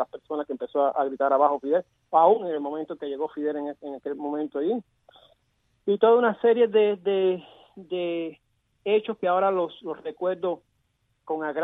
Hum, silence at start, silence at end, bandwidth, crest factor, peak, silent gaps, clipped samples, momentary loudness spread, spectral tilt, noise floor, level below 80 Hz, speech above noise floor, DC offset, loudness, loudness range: none; 0 s; 0 s; 4 kHz; 20 dB; -6 dBFS; none; under 0.1%; 14 LU; -8.5 dB/octave; -72 dBFS; -76 dBFS; 47 dB; under 0.1%; -25 LUFS; 5 LU